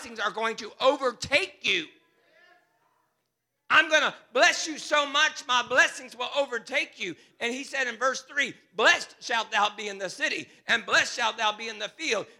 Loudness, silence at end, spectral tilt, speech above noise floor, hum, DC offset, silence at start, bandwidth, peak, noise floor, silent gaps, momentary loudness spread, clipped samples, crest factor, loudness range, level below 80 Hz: -26 LUFS; 0.15 s; -1 dB/octave; 53 dB; none; under 0.1%; 0 s; 15.5 kHz; -6 dBFS; -80 dBFS; none; 11 LU; under 0.1%; 22 dB; 4 LU; -72 dBFS